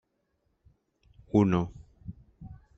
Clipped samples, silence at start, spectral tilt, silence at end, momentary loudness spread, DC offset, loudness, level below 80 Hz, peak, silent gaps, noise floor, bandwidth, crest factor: under 0.1%; 1.35 s; -8.5 dB/octave; 0.25 s; 25 LU; under 0.1%; -27 LUFS; -56 dBFS; -10 dBFS; none; -76 dBFS; 7.6 kHz; 22 dB